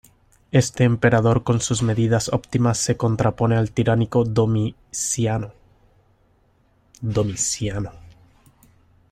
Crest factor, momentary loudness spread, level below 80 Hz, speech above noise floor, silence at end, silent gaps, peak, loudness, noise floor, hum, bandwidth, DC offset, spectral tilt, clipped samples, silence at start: 18 dB; 9 LU; -46 dBFS; 40 dB; 1.1 s; none; -4 dBFS; -21 LUFS; -60 dBFS; none; 13.5 kHz; under 0.1%; -5.5 dB/octave; under 0.1%; 0.55 s